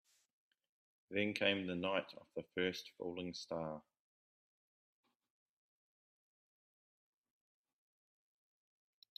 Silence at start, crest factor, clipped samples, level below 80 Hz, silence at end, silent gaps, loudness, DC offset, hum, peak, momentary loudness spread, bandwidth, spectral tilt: 1.1 s; 28 dB; under 0.1%; -84 dBFS; 5.35 s; none; -41 LUFS; under 0.1%; none; -18 dBFS; 12 LU; 12.5 kHz; -5 dB/octave